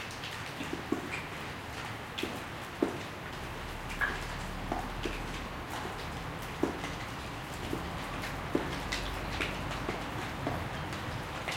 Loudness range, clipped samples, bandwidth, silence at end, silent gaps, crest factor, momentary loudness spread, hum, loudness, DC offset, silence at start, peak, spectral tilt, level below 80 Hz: 2 LU; under 0.1%; 17 kHz; 0 s; none; 24 dB; 5 LU; none; -37 LUFS; under 0.1%; 0 s; -14 dBFS; -4.5 dB/octave; -48 dBFS